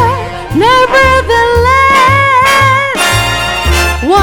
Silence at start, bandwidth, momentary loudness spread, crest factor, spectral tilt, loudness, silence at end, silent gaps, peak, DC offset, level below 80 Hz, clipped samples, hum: 0 s; 19.5 kHz; 5 LU; 8 dB; -4 dB/octave; -8 LUFS; 0 s; none; 0 dBFS; under 0.1%; -20 dBFS; 0.4%; none